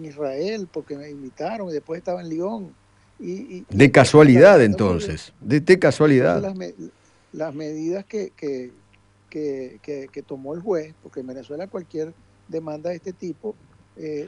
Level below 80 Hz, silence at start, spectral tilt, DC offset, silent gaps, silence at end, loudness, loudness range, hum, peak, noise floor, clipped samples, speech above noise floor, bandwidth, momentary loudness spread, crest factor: -52 dBFS; 0 s; -6.5 dB/octave; under 0.1%; none; 0 s; -19 LUFS; 16 LU; none; 0 dBFS; -56 dBFS; under 0.1%; 36 dB; 11 kHz; 23 LU; 20 dB